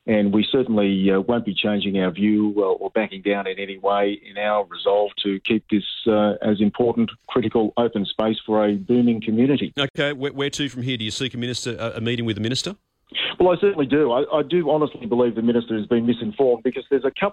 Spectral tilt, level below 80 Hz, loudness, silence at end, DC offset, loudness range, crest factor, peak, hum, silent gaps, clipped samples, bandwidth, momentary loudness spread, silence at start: -6 dB/octave; -56 dBFS; -21 LUFS; 0 s; under 0.1%; 3 LU; 14 dB; -8 dBFS; none; 9.90-9.94 s; under 0.1%; 10.5 kHz; 6 LU; 0.05 s